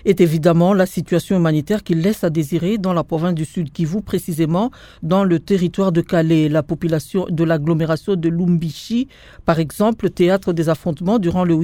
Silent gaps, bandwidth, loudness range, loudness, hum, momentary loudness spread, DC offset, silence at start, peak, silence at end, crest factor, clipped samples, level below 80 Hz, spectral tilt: none; 16.5 kHz; 2 LU; -18 LUFS; none; 7 LU; under 0.1%; 0.05 s; 0 dBFS; 0 s; 16 dB; under 0.1%; -44 dBFS; -7.5 dB/octave